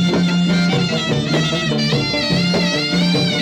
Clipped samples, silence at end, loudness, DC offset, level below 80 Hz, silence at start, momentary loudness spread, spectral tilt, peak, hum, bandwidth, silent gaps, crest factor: under 0.1%; 0 s; -16 LUFS; under 0.1%; -44 dBFS; 0 s; 2 LU; -5 dB/octave; -6 dBFS; none; 10 kHz; none; 10 dB